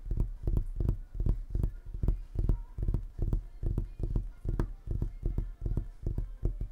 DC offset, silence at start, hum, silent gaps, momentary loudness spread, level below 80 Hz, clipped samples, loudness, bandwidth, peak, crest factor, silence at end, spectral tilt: under 0.1%; 0 s; none; none; 4 LU; -34 dBFS; under 0.1%; -37 LUFS; 2.2 kHz; -14 dBFS; 18 dB; 0 s; -10 dB/octave